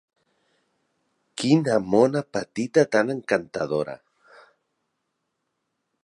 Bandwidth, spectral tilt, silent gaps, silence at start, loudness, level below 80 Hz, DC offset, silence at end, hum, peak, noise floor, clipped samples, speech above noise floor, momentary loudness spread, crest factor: 11.5 kHz; -6 dB/octave; none; 1.35 s; -23 LUFS; -66 dBFS; under 0.1%; 2.05 s; none; -6 dBFS; -78 dBFS; under 0.1%; 56 dB; 11 LU; 20 dB